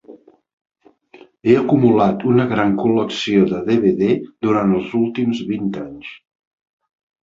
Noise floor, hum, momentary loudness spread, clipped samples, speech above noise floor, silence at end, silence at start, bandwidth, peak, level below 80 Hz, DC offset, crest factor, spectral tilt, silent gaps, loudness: -47 dBFS; none; 9 LU; under 0.1%; 31 dB; 1.05 s; 0.1 s; 7.6 kHz; -2 dBFS; -54 dBFS; under 0.1%; 16 dB; -7.5 dB/octave; 0.53-0.65 s; -17 LUFS